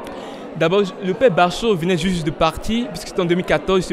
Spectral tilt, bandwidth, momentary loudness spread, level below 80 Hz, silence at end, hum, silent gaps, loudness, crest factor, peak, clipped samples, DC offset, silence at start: -5.5 dB/octave; 15.5 kHz; 8 LU; -38 dBFS; 0 s; none; none; -19 LUFS; 16 dB; -2 dBFS; under 0.1%; under 0.1%; 0 s